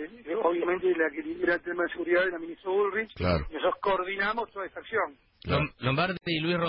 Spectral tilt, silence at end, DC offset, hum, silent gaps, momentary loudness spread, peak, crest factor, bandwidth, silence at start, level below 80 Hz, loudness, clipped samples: -10 dB/octave; 0 s; under 0.1%; none; none; 7 LU; -14 dBFS; 16 dB; 5.6 kHz; 0 s; -48 dBFS; -29 LUFS; under 0.1%